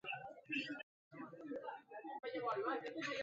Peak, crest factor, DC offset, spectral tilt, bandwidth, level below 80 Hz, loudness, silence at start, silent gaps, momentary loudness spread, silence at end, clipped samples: -30 dBFS; 16 dB; under 0.1%; -1.5 dB/octave; 7.6 kHz; -88 dBFS; -45 LUFS; 0.05 s; 0.83-1.11 s; 12 LU; 0 s; under 0.1%